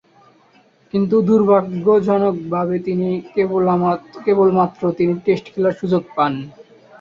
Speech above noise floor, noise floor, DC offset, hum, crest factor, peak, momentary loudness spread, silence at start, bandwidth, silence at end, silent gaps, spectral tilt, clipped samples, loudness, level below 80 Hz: 37 dB; -53 dBFS; under 0.1%; none; 16 dB; -2 dBFS; 7 LU; 0.95 s; 7 kHz; 0.4 s; none; -9 dB/octave; under 0.1%; -17 LUFS; -58 dBFS